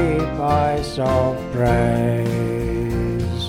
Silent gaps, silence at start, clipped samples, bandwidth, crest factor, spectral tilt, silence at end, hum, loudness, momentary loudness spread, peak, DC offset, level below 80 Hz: none; 0 s; under 0.1%; 15.5 kHz; 14 dB; -7.5 dB/octave; 0 s; none; -20 LUFS; 5 LU; -6 dBFS; under 0.1%; -32 dBFS